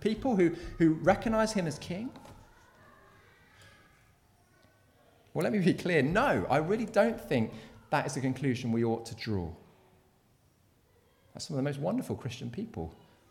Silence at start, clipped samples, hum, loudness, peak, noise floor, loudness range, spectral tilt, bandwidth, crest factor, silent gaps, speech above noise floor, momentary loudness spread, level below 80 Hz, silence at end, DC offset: 0 s; under 0.1%; none; -31 LUFS; -10 dBFS; -67 dBFS; 9 LU; -6.5 dB/octave; 16 kHz; 22 dB; none; 37 dB; 13 LU; -56 dBFS; 0.35 s; under 0.1%